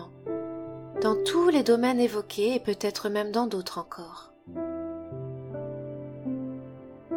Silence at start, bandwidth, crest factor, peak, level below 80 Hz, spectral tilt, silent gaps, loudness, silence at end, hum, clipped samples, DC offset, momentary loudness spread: 0 s; 17.5 kHz; 18 dB; -10 dBFS; -66 dBFS; -5 dB/octave; none; -29 LUFS; 0 s; none; under 0.1%; under 0.1%; 18 LU